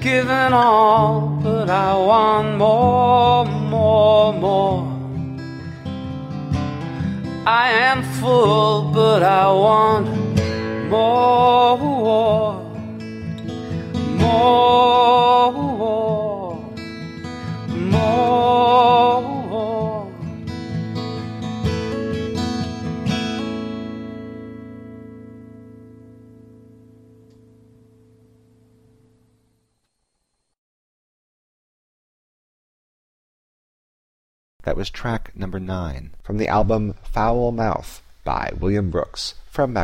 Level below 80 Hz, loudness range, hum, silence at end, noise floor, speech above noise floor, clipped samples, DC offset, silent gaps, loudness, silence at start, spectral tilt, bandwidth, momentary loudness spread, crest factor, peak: -40 dBFS; 13 LU; none; 0 s; -74 dBFS; 57 dB; under 0.1%; under 0.1%; 30.58-34.60 s; -18 LUFS; 0 s; -6.5 dB/octave; 14.5 kHz; 17 LU; 16 dB; -2 dBFS